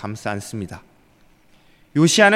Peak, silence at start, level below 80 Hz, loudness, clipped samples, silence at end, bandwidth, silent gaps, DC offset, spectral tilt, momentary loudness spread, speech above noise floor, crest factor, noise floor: 0 dBFS; 0 s; -60 dBFS; -20 LUFS; under 0.1%; 0 s; 15.5 kHz; none; under 0.1%; -4 dB/octave; 19 LU; 36 dB; 20 dB; -54 dBFS